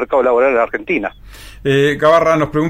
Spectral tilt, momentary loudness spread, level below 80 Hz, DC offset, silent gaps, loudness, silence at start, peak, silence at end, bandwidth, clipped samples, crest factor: -6 dB/octave; 8 LU; -40 dBFS; under 0.1%; none; -14 LUFS; 0 s; -2 dBFS; 0 s; 15.5 kHz; under 0.1%; 12 dB